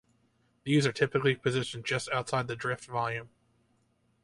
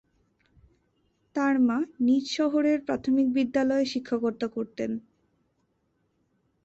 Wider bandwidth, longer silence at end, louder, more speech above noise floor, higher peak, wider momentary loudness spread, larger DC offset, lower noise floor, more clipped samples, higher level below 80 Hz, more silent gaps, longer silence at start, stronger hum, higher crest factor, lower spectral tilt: first, 11.5 kHz vs 8 kHz; second, 0.95 s vs 1.65 s; second, -30 LUFS vs -26 LUFS; second, 41 dB vs 47 dB; about the same, -12 dBFS vs -12 dBFS; about the same, 7 LU vs 9 LU; neither; about the same, -71 dBFS vs -73 dBFS; neither; about the same, -66 dBFS vs -66 dBFS; neither; second, 0.65 s vs 1.35 s; neither; about the same, 20 dB vs 16 dB; about the same, -5 dB/octave vs -5 dB/octave